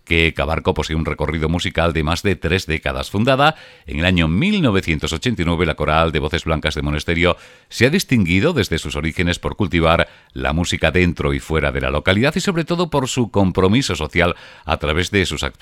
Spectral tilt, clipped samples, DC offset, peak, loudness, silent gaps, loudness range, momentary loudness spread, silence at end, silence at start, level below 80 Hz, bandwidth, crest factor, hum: -5.5 dB/octave; under 0.1%; under 0.1%; 0 dBFS; -18 LUFS; none; 1 LU; 6 LU; 0.1 s; 0.05 s; -32 dBFS; 15.5 kHz; 18 dB; none